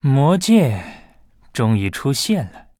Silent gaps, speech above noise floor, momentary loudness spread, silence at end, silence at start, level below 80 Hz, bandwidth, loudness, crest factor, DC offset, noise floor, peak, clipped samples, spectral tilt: none; 32 dB; 14 LU; 0.2 s; 0.05 s; -50 dBFS; 16.5 kHz; -18 LUFS; 16 dB; under 0.1%; -49 dBFS; -2 dBFS; under 0.1%; -6 dB/octave